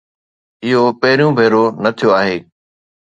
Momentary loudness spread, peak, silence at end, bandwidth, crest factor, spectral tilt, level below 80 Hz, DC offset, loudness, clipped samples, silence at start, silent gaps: 7 LU; 0 dBFS; 0.65 s; 8.6 kHz; 14 dB; -6.5 dB/octave; -58 dBFS; under 0.1%; -13 LUFS; under 0.1%; 0.6 s; none